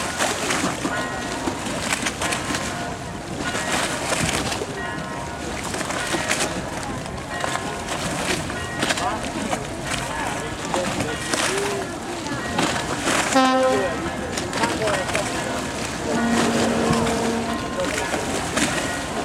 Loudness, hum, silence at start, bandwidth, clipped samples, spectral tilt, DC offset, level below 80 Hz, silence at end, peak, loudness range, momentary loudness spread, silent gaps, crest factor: -23 LUFS; none; 0 s; 16.5 kHz; under 0.1%; -3.5 dB/octave; under 0.1%; -42 dBFS; 0 s; -6 dBFS; 4 LU; 8 LU; none; 18 dB